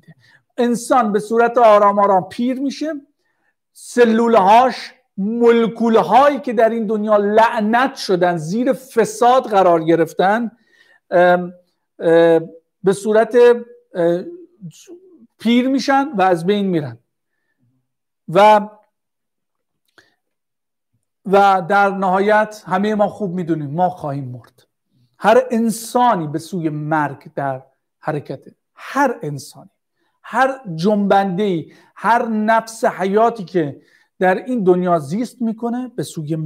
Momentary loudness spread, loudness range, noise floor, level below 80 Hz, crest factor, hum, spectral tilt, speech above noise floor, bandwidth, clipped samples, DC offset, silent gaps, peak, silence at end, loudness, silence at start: 13 LU; 5 LU; -86 dBFS; -68 dBFS; 16 dB; none; -6 dB/octave; 70 dB; 16 kHz; under 0.1%; under 0.1%; none; -2 dBFS; 0 s; -16 LUFS; 0.6 s